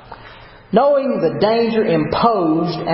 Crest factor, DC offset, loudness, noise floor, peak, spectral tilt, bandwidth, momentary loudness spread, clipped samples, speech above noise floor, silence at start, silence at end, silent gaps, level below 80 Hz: 16 dB; under 0.1%; -16 LUFS; -40 dBFS; 0 dBFS; -10 dB/octave; 5.8 kHz; 4 LU; under 0.1%; 25 dB; 0.1 s; 0 s; none; -48 dBFS